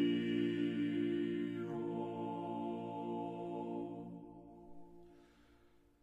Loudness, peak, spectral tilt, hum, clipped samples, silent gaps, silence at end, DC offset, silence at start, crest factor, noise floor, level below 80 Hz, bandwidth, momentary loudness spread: -40 LUFS; -24 dBFS; -8 dB/octave; none; under 0.1%; none; 0.35 s; under 0.1%; 0 s; 16 dB; -67 dBFS; -74 dBFS; 7.8 kHz; 21 LU